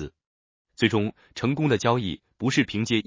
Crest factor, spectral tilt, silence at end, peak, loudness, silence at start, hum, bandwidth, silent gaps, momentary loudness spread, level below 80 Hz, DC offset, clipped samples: 20 dB; -5.5 dB/octave; 0.05 s; -6 dBFS; -25 LUFS; 0 s; none; 7.8 kHz; 0.27-0.65 s; 8 LU; -52 dBFS; under 0.1%; under 0.1%